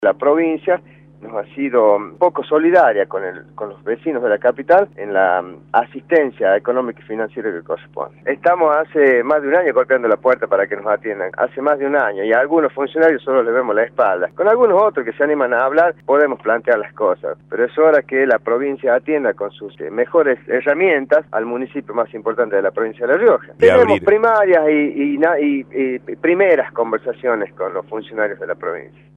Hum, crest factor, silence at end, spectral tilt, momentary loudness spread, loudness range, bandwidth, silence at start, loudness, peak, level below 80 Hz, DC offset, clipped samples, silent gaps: none; 16 dB; 0.35 s; -7.5 dB/octave; 12 LU; 4 LU; 4.9 kHz; 0 s; -16 LUFS; 0 dBFS; -60 dBFS; under 0.1%; under 0.1%; none